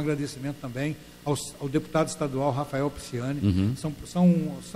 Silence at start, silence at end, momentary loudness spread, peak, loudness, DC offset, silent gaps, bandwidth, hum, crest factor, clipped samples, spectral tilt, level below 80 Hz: 0 s; 0 s; 10 LU; -10 dBFS; -28 LUFS; under 0.1%; none; 15 kHz; none; 16 dB; under 0.1%; -6.5 dB/octave; -52 dBFS